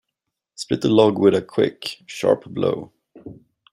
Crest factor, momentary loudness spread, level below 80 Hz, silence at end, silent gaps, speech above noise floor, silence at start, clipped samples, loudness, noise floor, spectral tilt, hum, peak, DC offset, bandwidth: 20 dB; 15 LU; -60 dBFS; 0.4 s; none; 62 dB; 0.6 s; under 0.1%; -20 LUFS; -81 dBFS; -6 dB/octave; none; -2 dBFS; under 0.1%; 13 kHz